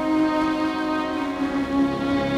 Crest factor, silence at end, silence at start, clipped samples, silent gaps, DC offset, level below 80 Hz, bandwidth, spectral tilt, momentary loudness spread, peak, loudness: 12 dB; 0 s; 0 s; under 0.1%; none; under 0.1%; -46 dBFS; 12 kHz; -6 dB/octave; 4 LU; -10 dBFS; -23 LUFS